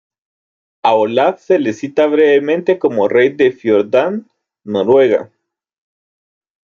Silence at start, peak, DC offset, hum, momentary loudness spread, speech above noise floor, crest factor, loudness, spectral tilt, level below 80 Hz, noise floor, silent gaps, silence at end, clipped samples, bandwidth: 0.85 s; -2 dBFS; under 0.1%; none; 7 LU; over 77 dB; 14 dB; -14 LUFS; -6.5 dB/octave; -64 dBFS; under -90 dBFS; none; 1.45 s; under 0.1%; 7.2 kHz